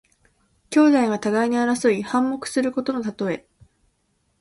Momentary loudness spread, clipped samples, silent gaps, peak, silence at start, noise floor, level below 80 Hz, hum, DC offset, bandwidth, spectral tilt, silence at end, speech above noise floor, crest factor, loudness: 10 LU; under 0.1%; none; -6 dBFS; 0.7 s; -68 dBFS; -62 dBFS; none; under 0.1%; 11.5 kHz; -5 dB/octave; 1 s; 48 dB; 18 dB; -21 LUFS